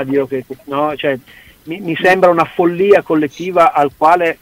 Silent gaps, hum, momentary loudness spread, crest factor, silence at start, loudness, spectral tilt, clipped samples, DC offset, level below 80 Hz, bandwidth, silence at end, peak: none; none; 12 LU; 14 dB; 0 s; -13 LUFS; -6 dB/octave; under 0.1%; under 0.1%; -52 dBFS; 16 kHz; 0.05 s; 0 dBFS